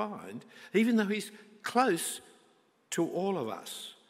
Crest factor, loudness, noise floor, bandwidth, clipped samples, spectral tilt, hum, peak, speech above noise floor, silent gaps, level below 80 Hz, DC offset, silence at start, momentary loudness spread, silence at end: 20 dB; -32 LUFS; -67 dBFS; 16 kHz; under 0.1%; -4.5 dB/octave; none; -12 dBFS; 35 dB; none; -86 dBFS; under 0.1%; 0 s; 16 LU; 0.15 s